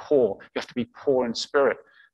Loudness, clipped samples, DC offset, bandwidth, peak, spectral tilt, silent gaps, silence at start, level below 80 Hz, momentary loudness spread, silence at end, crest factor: -25 LUFS; under 0.1%; under 0.1%; 8.8 kHz; -8 dBFS; -4.5 dB/octave; none; 0 s; -64 dBFS; 10 LU; 0.35 s; 16 dB